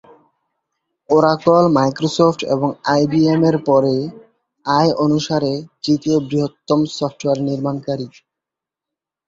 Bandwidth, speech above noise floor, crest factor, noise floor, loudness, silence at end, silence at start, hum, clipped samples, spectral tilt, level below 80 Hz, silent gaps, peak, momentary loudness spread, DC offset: 7.8 kHz; 69 dB; 16 dB; -86 dBFS; -17 LUFS; 1.2 s; 1.1 s; none; under 0.1%; -6.5 dB/octave; -56 dBFS; none; -2 dBFS; 9 LU; under 0.1%